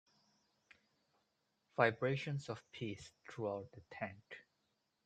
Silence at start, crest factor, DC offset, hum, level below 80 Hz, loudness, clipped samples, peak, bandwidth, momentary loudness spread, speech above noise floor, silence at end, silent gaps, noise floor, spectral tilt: 1.75 s; 28 dB; under 0.1%; none; -80 dBFS; -41 LUFS; under 0.1%; -16 dBFS; 9.2 kHz; 20 LU; 43 dB; 0.65 s; none; -84 dBFS; -6 dB/octave